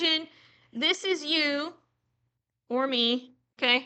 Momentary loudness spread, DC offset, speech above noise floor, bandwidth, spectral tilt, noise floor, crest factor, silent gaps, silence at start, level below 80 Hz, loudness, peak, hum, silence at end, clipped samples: 11 LU; under 0.1%; 52 dB; 9 kHz; -1.5 dB/octave; -79 dBFS; 20 dB; none; 0 s; -84 dBFS; -27 LUFS; -8 dBFS; none; 0 s; under 0.1%